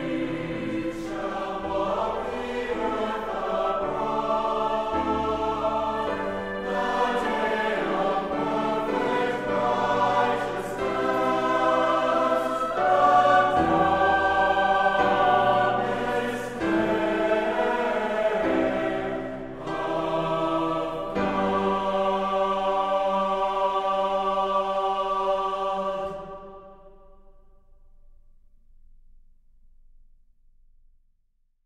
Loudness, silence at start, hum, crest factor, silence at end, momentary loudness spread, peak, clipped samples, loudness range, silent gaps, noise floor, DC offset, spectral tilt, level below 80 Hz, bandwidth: -25 LUFS; 0 s; none; 18 dB; 4.7 s; 9 LU; -8 dBFS; under 0.1%; 7 LU; none; -67 dBFS; under 0.1%; -5.5 dB/octave; -48 dBFS; 14 kHz